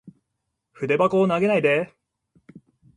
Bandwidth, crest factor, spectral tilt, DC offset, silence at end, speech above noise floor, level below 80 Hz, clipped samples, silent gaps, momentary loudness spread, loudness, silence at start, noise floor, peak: 10.5 kHz; 18 dB; -7 dB/octave; under 0.1%; 0.4 s; 59 dB; -66 dBFS; under 0.1%; none; 11 LU; -21 LUFS; 0.05 s; -79 dBFS; -6 dBFS